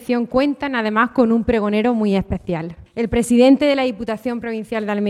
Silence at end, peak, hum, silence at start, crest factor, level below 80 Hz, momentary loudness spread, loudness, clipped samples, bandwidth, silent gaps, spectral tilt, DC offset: 0 s; -2 dBFS; none; 0 s; 16 dB; -40 dBFS; 12 LU; -18 LUFS; under 0.1%; 13 kHz; none; -6 dB/octave; under 0.1%